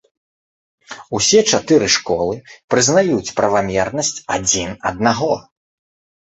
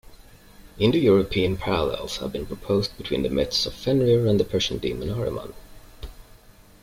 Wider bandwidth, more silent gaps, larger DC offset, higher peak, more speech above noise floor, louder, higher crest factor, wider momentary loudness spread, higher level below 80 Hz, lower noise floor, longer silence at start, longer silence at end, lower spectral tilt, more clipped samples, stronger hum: second, 8.2 kHz vs 16.5 kHz; first, 2.64-2.68 s vs none; neither; first, -2 dBFS vs -6 dBFS; first, over 74 dB vs 27 dB; first, -16 LUFS vs -23 LUFS; about the same, 16 dB vs 18 dB; second, 10 LU vs 15 LU; second, -48 dBFS vs -42 dBFS; first, under -90 dBFS vs -50 dBFS; first, 0.9 s vs 0.1 s; first, 0.9 s vs 0.6 s; second, -3 dB/octave vs -6 dB/octave; neither; neither